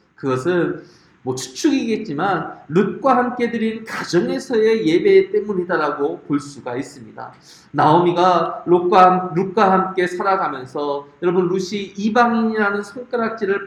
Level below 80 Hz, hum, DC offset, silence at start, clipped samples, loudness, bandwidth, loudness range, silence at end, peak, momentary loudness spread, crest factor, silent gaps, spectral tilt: -62 dBFS; none; under 0.1%; 0.25 s; under 0.1%; -18 LUFS; 12 kHz; 4 LU; 0 s; 0 dBFS; 13 LU; 18 dB; none; -6 dB/octave